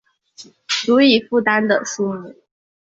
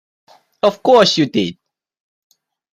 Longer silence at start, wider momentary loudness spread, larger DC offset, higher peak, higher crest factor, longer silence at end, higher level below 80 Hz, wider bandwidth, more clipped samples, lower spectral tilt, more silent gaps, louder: second, 0.4 s vs 0.65 s; about the same, 11 LU vs 9 LU; neither; about the same, -2 dBFS vs -2 dBFS; about the same, 18 dB vs 16 dB; second, 0.65 s vs 1.2 s; second, -64 dBFS vs -58 dBFS; second, 7.8 kHz vs 14 kHz; neither; about the same, -3.5 dB/octave vs -4.5 dB/octave; neither; second, -17 LUFS vs -14 LUFS